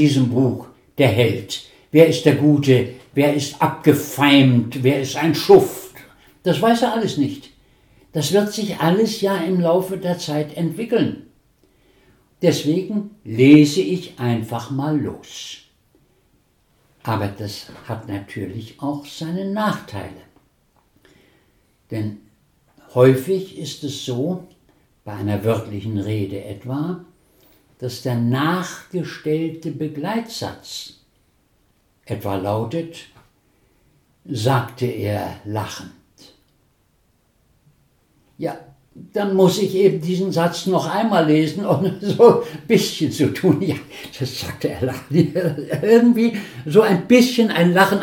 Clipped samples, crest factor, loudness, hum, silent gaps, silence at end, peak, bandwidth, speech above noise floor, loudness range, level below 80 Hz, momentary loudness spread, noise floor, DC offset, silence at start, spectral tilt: under 0.1%; 20 dB; -19 LUFS; none; none; 0 s; 0 dBFS; 18.5 kHz; 43 dB; 13 LU; -58 dBFS; 17 LU; -62 dBFS; under 0.1%; 0 s; -6 dB/octave